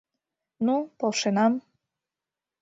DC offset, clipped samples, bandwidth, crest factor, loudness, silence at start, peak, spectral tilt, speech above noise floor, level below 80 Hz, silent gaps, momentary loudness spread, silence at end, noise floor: under 0.1%; under 0.1%; 8 kHz; 18 dB; -26 LUFS; 0.6 s; -10 dBFS; -4.5 dB/octave; 65 dB; -76 dBFS; none; 6 LU; 1 s; -89 dBFS